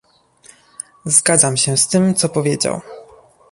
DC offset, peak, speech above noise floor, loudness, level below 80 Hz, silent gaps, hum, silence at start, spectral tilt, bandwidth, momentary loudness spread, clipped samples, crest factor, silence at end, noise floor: under 0.1%; 0 dBFS; 33 dB; -14 LUFS; -56 dBFS; none; none; 1.05 s; -3.5 dB/octave; 12 kHz; 17 LU; under 0.1%; 18 dB; 0.5 s; -49 dBFS